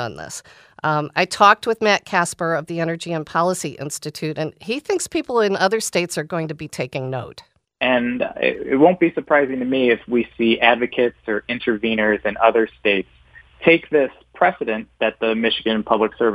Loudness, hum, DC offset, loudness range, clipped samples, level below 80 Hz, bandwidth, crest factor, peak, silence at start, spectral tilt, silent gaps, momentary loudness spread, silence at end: -19 LUFS; none; under 0.1%; 5 LU; under 0.1%; -56 dBFS; 15.5 kHz; 20 dB; 0 dBFS; 0 s; -4.5 dB/octave; none; 11 LU; 0 s